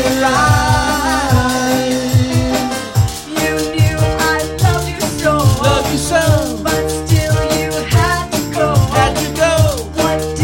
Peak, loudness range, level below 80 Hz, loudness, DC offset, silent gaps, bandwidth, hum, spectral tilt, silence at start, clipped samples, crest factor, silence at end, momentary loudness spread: 0 dBFS; 1 LU; -28 dBFS; -14 LUFS; under 0.1%; none; 17 kHz; none; -5 dB/octave; 0 s; under 0.1%; 12 dB; 0 s; 5 LU